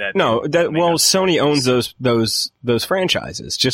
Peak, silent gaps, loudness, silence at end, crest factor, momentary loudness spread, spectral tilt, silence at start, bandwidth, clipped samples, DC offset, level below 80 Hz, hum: -2 dBFS; none; -17 LUFS; 0 s; 16 dB; 6 LU; -3.5 dB/octave; 0 s; 16.5 kHz; under 0.1%; under 0.1%; -50 dBFS; none